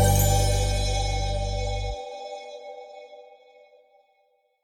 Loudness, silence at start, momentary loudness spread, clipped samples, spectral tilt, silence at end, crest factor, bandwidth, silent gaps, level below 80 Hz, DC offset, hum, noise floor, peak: -26 LUFS; 0 s; 23 LU; under 0.1%; -4 dB/octave; 1.4 s; 18 dB; 17.5 kHz; none; -30 dBFS; under 0.1%; none; -68 dBFS; -8 dBFS